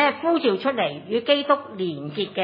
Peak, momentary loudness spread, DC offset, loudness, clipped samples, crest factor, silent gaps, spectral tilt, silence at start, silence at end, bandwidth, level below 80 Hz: -6 dBFS; 9 LU; under 0.1%; -23 LUFS; under 0.1%; 18 dB; none; -8 dB/octave; 0 s; 0 s; 5.4 kHz; -76 dBFS